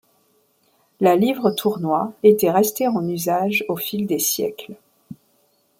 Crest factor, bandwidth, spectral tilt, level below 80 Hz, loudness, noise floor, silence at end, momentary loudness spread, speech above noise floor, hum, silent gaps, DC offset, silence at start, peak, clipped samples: 18 dB; 16.5 kHz; -4.5 dB/octave; -66 dBFS; -19 LUFS; -63 dBFS; 0.65 s; 8 LU; 43 dB; none; none; under 0.1%; 1 s; -2 dBFS; under 0.1%